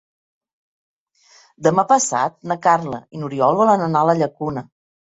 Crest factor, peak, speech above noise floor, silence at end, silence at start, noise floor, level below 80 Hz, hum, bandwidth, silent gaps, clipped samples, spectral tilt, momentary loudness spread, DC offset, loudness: 18 dB; -2 dBFS; 35 dB; 0.5 s; 1.6 s; -53 dBFS; -62 dBFS; none; 8 kHz; none; under 0.1%; -5 dB/octave; 12 LU; under 0.1%; -18 LUFS